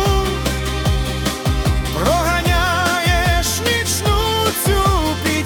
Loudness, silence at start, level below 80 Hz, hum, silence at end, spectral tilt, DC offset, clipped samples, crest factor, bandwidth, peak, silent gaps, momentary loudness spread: -17 LUFS; 0 s; -24 dBFS; none; 0 s; -4 dB/octave; under 0.1%; under 0.1%; 14 dB; 18 kHz; -4 dBFS; none; 4 LU